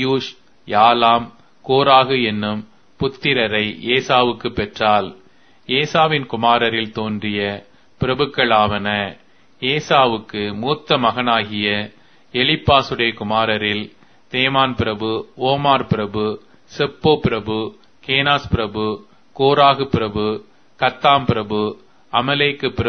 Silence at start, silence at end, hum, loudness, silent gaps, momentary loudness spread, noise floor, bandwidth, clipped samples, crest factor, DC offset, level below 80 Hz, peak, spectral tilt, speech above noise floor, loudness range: 0 s; 0 s; none; -17 LUFS; none; 11 LU; -51 dBFS; 6.6 kHz; under 0.1%; 18 dB; 0.3%; -44 dBFS; 0 dBFS; -6 dB/octave; 34 dB; 2 LU